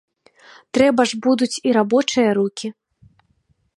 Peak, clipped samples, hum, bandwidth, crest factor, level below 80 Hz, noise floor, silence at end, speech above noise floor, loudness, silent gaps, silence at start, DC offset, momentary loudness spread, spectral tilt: -2 dBFS; under 0.1%; none; 11.5 kHz; 18 dB; -60 dBFS; -64 dBFS; 1.05 s; 46 dB; -18 LUFS; none; 0.75 s; under 0.1%; 9 LU; -4 dB/octave